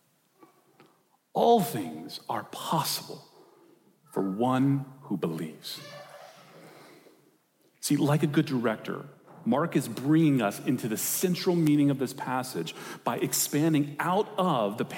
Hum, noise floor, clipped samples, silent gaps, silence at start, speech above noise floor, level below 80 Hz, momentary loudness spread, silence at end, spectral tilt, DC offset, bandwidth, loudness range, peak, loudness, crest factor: none; -67 dBFS; under 0.1%; none; 1.35 s; 39 dB; -78 dBFS; 15 LU; 0 s; -5 dB/octave; under 0.1%; 17 kHz; 5 LU; -10 dBFS; -28 LUFS; 18 dB